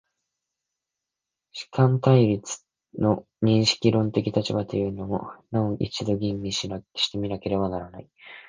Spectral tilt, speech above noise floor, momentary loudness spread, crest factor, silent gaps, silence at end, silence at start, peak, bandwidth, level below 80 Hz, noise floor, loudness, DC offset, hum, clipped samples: -6 dB/octave; 62 dB; 16 LU; 22 dB; none; 0.05 s; 1.55 s; -4 dBFS; 9.8 kHz; -52 dBFS; -86 dBFS; -25 LUFS; under 0.1%; none; under 0.1%